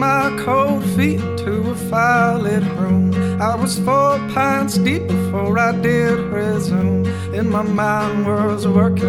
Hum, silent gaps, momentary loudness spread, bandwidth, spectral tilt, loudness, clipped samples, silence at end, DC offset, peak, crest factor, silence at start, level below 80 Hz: none; none; 5 LU; 15 kHz; -6.5 dB/octave; -17 LUFS; under 0.1%; 0 s; under 0.1%; -2 dBFS; 14 dB; 0 s; -44 dBFS